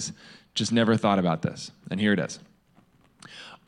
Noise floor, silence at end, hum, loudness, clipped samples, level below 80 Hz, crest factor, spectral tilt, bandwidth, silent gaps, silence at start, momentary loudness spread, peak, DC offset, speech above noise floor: -61 dBFS; 0.15 s; none; -26 LUFS; under 0.1%; -68 dBFS; 18 dB; -5 dB/octave; 11 kHz; none; 0 s; 21 LU; -8 dBFS; under 0.1%; 35 dB